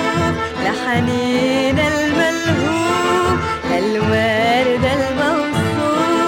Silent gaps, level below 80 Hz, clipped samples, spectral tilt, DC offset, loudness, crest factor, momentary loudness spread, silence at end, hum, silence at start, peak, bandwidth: none; -40 dBFS; under 0.1%; -5 dB/octave; under 0.1%; -16 LUFS; 14 dB; 4 LU; 0 s; none; 0 s; -4 dBFS; 17 kHz